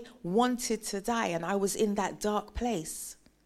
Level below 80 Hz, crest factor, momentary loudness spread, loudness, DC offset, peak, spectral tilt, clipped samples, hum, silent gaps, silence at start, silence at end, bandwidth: -54 dBFS; 18 dB; 7 LU; -31 LUFS; under 0.1%; -14 dBFS; -4 dB/octave; under 0.1%; none; none; 0 s; 0.35 s; 15.5 kHz